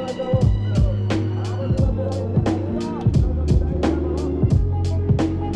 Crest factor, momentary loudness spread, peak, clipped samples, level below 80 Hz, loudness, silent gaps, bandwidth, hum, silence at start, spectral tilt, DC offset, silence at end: 12 dB; 4 LU; -6 dBFS; under 0.1%; -26 dBFS; -21 LUFS; none; 9.2 kHz; none; 0 s; -8.5 dB/octave; under 0.1%; 0 s